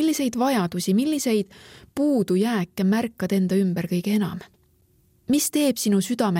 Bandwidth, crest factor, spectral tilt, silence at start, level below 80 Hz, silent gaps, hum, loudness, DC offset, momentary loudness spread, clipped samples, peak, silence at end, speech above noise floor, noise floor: 17 kHz; 14 dB; -5.5 dB/octave; 0 s; -62 dBFS; none; none; -23 LUFS; under 0.1%; 5 LU; under 0.1%; -8 dBFS; 0 s; 39 dB; -61 dBFS